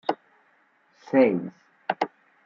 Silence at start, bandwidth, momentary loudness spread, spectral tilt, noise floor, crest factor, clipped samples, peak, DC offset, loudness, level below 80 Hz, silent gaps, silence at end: 0.1 s; 7 kHz; 17 LU; -7.5 dB/octave; -64 dBFS; 22 dB; under 0.1%; -6 dBFS; under 0.1%; -25 LUFS; -78 dBFS; none; 0.4 s